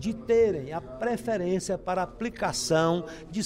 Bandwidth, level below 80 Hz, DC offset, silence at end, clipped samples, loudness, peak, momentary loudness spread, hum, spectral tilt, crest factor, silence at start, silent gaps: 15.5 kHz; -52 dBFS; under 0.1%; 0 s; under 0.1%; -28 LUFS; -10 dBFS; 9 LU; none; -5 dB/octave; 18 dB; 0 s; none